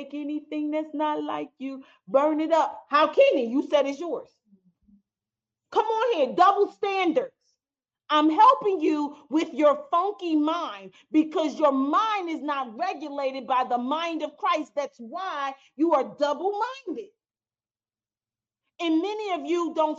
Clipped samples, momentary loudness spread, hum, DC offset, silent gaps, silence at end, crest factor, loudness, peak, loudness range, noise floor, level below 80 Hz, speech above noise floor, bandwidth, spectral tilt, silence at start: under 0.1%; 13 LU; none; under 0.1%; none; 0 s; 18 dB; -25 LUFS; -8 dBFS; 7 LU; under -90 dBFS; -80 dBFS; over 65 dB; 7.6 kHz; -4 dB/octave; 0 s